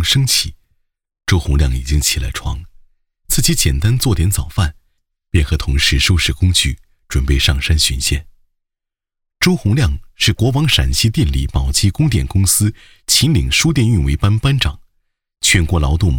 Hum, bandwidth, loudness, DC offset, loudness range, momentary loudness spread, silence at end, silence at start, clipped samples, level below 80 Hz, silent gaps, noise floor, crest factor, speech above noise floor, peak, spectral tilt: none; 18 kHz; -15 LUFS; under 0.1%; 3 LU; 7 LU; 0 s; 0 s; under 0.1%; -22 dBFS; none; -82 dBFS; 14 dB; 67 dB; -2 dBFS; -3.5 dB/octave